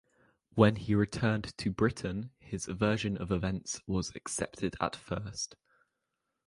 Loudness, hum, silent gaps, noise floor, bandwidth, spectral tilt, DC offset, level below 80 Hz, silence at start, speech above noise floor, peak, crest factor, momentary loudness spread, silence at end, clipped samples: -33 LUFS; none; none; -84 dBFS; 11.5 kHz; -5.5 dB/octave; under 0.1%; -52 dBFS; 0.55 s; 53 dB; -8 dBFS; 24 dB; 12 LU; 0.95 s; under 0.1%